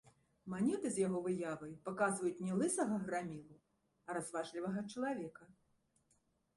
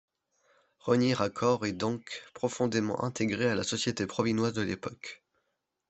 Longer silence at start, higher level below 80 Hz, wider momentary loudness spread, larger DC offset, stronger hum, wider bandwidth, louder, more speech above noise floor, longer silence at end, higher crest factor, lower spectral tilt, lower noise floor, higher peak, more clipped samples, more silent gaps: second, 0.05 s vs 0.85 s; second, -76 dBFS vs -68 dBFS; about the same, 12 LU vs 12 LU; neither; neither; first, 11.5 kHz vs 8.4 kHz; second, -40 LUFS vs -30 LUFS; second, 39 dB vs 51 dB; first, 1.05 s vs 0.75 s; about the same, 18 dB vs 20 dB; about the same, -5.5 dB/octave vs -5 dB/octave; about the same, -78 dBFS vs -81 dBFS; second, -24 dBFS vs -10 dBFS; neither; neither